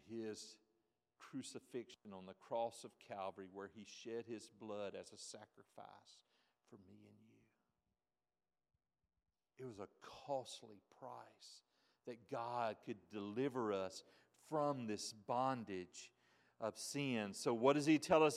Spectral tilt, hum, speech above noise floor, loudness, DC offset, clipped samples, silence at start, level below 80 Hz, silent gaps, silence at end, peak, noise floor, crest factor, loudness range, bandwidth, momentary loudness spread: -5 dB/octave; none; over 46 dB; -44 LUFS; under 0.1%; under 0.1%; 0.05 s; -84 dBFS; none; 0 s; -20 dBFS; under -90 dBFS; 24 dB; 17 LU; 14.5 kHz; 19 LU